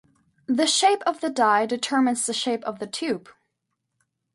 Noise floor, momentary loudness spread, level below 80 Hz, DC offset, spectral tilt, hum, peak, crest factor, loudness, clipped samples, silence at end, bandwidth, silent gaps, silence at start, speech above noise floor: -79 dBFS; 11 LU; -74 dBFS; under 0.1%; -2 dB/octave; none; -8 dBFS; 18 dB; -23 LUFS; under 0.1%; 1.15 s; 11.5 kHz; none; 0.5 s; 56 dB